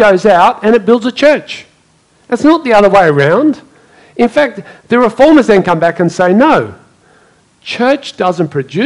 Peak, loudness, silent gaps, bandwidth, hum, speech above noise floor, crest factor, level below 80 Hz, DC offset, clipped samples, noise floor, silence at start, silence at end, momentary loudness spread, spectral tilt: 0 dBFS; -9 LUFS; none; 11 kHz; none; 41 dB; 10 dB; -44 dBFS; under 0.1%; 0.9%; -50 dBFS; 0 s; 0 s; 15 LU; -6 dB/octave